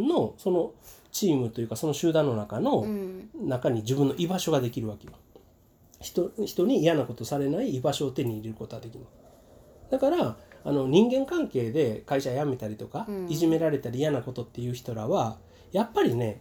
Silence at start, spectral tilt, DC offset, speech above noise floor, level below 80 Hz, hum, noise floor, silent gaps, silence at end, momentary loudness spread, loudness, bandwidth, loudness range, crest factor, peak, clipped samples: 0 s; -6 dB/octave; under 0.1%; 32 dB; -60 dBFS; none; -59 dBFS; none; 0 s; 11 LU; -28 LUFS; over 20 kHz; 3 LU; 20 dB; -6 dBFS; under 0.1%